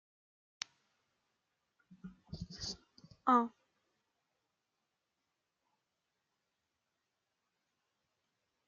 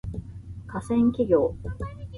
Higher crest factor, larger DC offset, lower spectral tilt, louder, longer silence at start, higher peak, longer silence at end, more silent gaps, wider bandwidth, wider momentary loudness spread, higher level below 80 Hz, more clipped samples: first, 30 dB vs 18 dB; neither; second, -3.5 dB/octave vs -9 dB/octave; second, -37 LUFS vs -25 LUFS; first, 2.05 s vs 0.05 s; second, -14 dBFS vs -8 dBFS; first, 5.2 s vs 0 s; neither; second, 7.2 kHz vs 11.5 kHz; first, 25 LU vs 17 LU; second, -70 dBFS vs -42 dBFS; neither